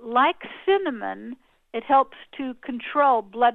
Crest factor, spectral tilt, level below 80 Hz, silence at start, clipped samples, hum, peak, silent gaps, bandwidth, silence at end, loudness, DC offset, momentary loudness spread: 16 dB; -6.5 dB/octave; -66 dBFS; 0 s; under 0.1%; none; -8 dBFS; none; 4.2 kHz; 0 s; -23 LUFS; under 0.1%; 14 LU